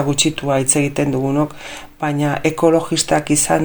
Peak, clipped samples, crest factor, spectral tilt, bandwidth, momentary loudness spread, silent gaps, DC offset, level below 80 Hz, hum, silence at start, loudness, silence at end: 0 dBFS; under 0.1%; 16 dB; -4 dB/octave; over 20 kHz; 8 LU; none; under 0.1%; -44 dBFS; none; 0 s; -17 LUFS; 0 s